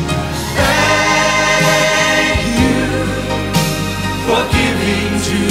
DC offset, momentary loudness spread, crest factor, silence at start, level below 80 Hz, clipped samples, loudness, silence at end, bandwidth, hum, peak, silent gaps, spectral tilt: under 0.1%; 7 LU; 14 dB; 0 s; -30 dBFS; under 0.1%; -13 LUFS; 0 s; 16 kHz; none; 0 dBFS; none; -4 dB/octave